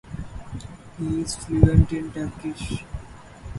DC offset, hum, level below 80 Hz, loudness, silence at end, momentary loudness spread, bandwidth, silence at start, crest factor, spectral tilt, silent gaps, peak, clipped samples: under 0.1%; none; -32 dBFS; -24 LUFS; 0 s; 21 LU; 11.5 kHz; 0.05 s; 24 dB; -7 dB/octave; none; 0 dBFS; under 0.1%